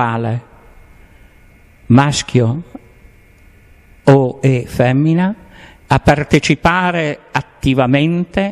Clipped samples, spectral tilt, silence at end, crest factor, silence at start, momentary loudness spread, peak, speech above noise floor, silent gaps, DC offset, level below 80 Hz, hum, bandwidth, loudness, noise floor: under 0.1%; -6.5 dB/octave; 0 s; 16 dB; 0 s; 9 LU; 0 dBFS; 32 dB; none; under 0.1%; -36 dBFS; none; 12.5 kHz; -14 LUFS; -45 dBFS